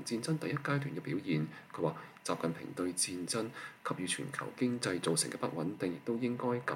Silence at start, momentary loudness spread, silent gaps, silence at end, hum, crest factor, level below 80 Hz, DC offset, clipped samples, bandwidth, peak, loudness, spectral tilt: 0 s; 6 LU; none; 0 s; none; 18 dB; -80 dBFS; under 0.1%; under 0.1%; 16.5 kHz; -18 dBFS; -36 LUFS; -4.5 dB/octave